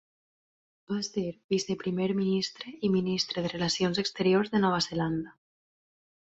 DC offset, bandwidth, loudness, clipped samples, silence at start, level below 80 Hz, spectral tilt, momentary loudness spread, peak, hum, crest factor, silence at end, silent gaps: under 0.1%; 8 kHz; -29 LUFS; under 0.1%; 0.9 s; -64 dBFS; -5 dB/octave; 8 LU; -14 dBFS; none; 16 dB; 0.9 s; 1.44-1.49 s